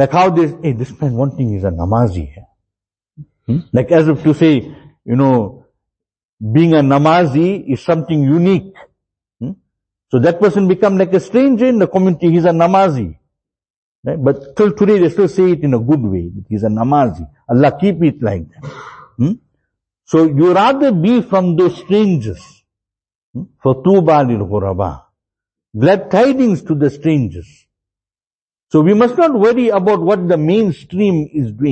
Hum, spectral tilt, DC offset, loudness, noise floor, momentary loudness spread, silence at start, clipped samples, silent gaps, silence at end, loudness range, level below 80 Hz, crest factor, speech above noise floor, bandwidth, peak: none; -8.5 dB/octave; under 0.1%; -13 LUFS; under -90 dBFS; 14 LU; 0 s; under 0.1%; 6.24-6.38 s, 13.70-14.03 s, 23.15-23.34 s, 28.34-28.48 s; 0 s; 3 LU; -44 dBFS; 14 dB; over 78 dB; 8.6 kHz; 0 dBFS